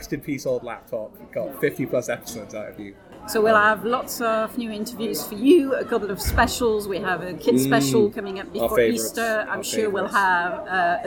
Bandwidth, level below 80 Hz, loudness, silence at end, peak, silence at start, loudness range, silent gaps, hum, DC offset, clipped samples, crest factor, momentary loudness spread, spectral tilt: 19 kHz; -42 dBFS; -22 LUFS; 0 s; -4 dBFS; 0 s; 3 LU; none; none; under 0.1%; under 0.1%; 18 dB; 15 LU; -4.5 dB/octave